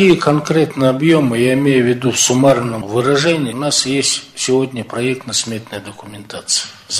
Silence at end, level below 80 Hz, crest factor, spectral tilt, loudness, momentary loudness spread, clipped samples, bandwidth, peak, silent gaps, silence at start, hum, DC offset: 0 s; -52 dBFS; 14 dB; -4 dB/octave; -15 LUFS; 12 LU; under 0.1%; 14 kHz; -2 dBFS; none; 0 s; none; under 0.1%